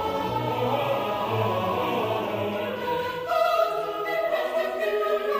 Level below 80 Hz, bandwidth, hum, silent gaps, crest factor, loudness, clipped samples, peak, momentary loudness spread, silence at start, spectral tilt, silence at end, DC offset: -58 dBFS; 15.5 kHz; none; none; 14 dB; -26 LUFS; under 0.1%; -12 dBFS; 4 LU; 0 s; -6 dB/octave; 0 s; under 0.1%